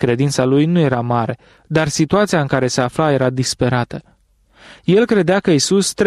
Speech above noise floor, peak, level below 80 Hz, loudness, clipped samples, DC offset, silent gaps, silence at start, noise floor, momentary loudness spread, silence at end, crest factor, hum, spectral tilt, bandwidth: 36 dB; -2 dBFS; -48 dBFS; -16 LUFS; under 0.1%; under 0.1%; none; 0 s; -52 dBFS; 7 LU; 0 s; 14 dB; none; -5.5 dB/octave; 14 kHz